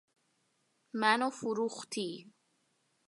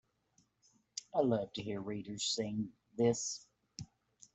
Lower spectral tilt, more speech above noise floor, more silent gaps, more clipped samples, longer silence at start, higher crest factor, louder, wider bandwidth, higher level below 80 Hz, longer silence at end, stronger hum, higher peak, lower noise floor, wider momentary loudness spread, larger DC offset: about the same, -3.5 dB/octave vs -4.5 dB/octave; first, 43 dB vs 39 dB; neither; neither; about the same, 0.95 s vs 0.95 s; about the same, 24 dB vs 22 dB; first, -33 LUFS vs -37 LUFS; first, 11.5 kHz vs 8.2 kHz; second, -90 dBFS vs -72 dBFS; first, 0.8 s vs 0.5 s; neither; first, -12 dBFS vs -18 dBFS; about the same, -76 dBFS vs -75 dBFS; second, 13 LU vs 18 LU; neither